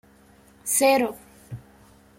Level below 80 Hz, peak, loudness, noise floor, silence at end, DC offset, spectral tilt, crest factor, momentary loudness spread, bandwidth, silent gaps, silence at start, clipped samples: -60 dBFS; -6 dBFS; -21 LUFS; -54 dBFS; 0.6 s; under 0.1%; -2.5 dB/octave; 20 dB; 23 LU; 16.5 kHz; none; 0.65 s; under 0.1%